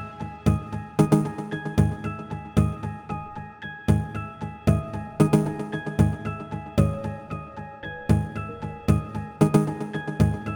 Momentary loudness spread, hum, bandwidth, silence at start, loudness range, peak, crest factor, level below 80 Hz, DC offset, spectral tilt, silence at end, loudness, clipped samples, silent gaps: 14 LU; none; 19 kHz; 0 s; 2 LU; -4 dBFS; 20 dB; -38 dBFS; under 0.1%; -8 dB/octave; 0 s; -26 LUFS; under 0.1%; none